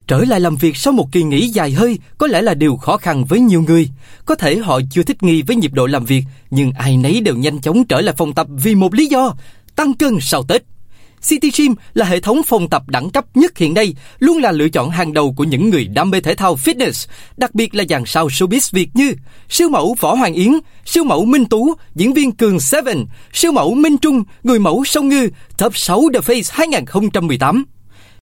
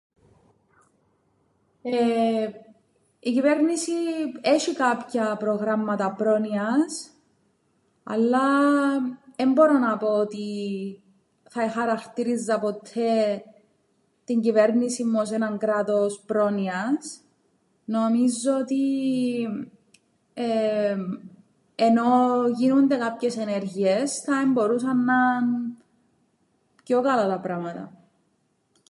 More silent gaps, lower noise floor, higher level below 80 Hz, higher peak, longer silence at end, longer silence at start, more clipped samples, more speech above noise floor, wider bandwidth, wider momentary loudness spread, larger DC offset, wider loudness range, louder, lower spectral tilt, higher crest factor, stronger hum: neither; second, -36 dBFS vs -69 dBFS; first, -44 dBFS vs -78 dBFS; first, 0 dBFS vs -6 dBFS; second, 0.3 s vs 1 s; second, 0.05 s vs 1.85 s; neither; second, 22 dB vs 47 dB; first, 17 kHz vs 11.5 kHz; second, 5 LU vs 12 LU; neither; second, 2 LU vs 5 LU; first, -14 LUFS vs -24 LUFS; about the same, -5 dB/octave vs -5 dB/octave; about the same, 14 dB vs 18 dB; neither